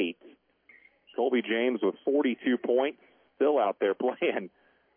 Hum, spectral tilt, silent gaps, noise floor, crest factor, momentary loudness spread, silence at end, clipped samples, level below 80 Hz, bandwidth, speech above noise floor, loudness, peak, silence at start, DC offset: none; -8.5 dB/octave; none; -61 dBFS; 14 dB; 9 LU; 0.5 s; under 0.1%; -86 dBFS; 3.6 kHz; 33 dB; -28 LUFS; -14 dBFS; 0 s; under 0.1%